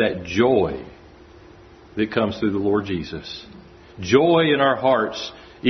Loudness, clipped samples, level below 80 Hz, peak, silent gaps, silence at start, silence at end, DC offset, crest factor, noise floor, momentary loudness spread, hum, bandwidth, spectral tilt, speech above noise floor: -20 LUFS; under 0.1%; -52 dBFS; -2 dBFS; none; 0 s; 0 s; under 0.1%; 20 dB; -46 dBFS; 17 LU; none; 6.4 kHz; -6 dB/octave; 26 dB